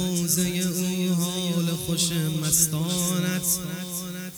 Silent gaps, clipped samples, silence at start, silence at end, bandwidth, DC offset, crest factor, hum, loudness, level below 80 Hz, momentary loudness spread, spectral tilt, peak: none; under 0.1%; 0 s; 0 s; over 20 kHz; under 0.1%; 20 dB; none; -24 LUFS; -54 dBFS; 7 LU; -4 dB/octave; -6 dBFS